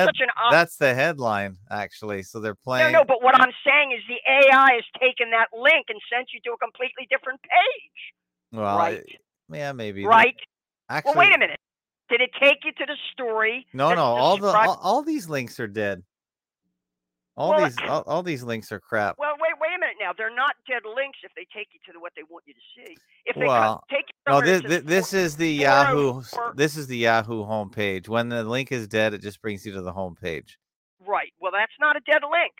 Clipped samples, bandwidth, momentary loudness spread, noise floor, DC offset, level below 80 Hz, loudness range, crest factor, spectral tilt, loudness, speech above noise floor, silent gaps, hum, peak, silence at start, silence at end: under 0.1%; 16.5 kHz; 16 LU; under -90 dBFS; under 0.1%; -66 dBFS; 10 LU; 20 dB; -4.5 dB/octave; -21 LUFS; over 68 dB; 30.76-30.97 s; none; -2 dBFS; 0 s; 0.1 s